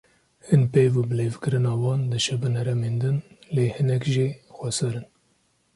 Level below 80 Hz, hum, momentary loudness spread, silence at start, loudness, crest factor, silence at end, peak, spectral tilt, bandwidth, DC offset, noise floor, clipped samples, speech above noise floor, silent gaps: -58 dBFS; none; 9 LU; 0.45 s; -24 LUFS; 18 dB; 0.7 s; -6 dBFS; -6 dB/octave; 11.5 kHz; under 0.1%; -66 dBFS; under 0.1%; 44 dB; none